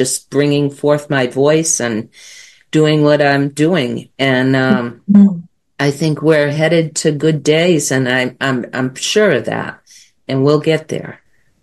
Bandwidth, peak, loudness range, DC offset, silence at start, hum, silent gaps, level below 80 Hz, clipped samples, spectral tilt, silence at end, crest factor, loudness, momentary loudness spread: 12.5 kHz; 0 dBFS; 3 LU; 0.1%; 0 s; none; none; -58 dBFS; under 0.1%; -5 dB/octave; 0.5 s; 14 dB; -14 LUFS; 10 LU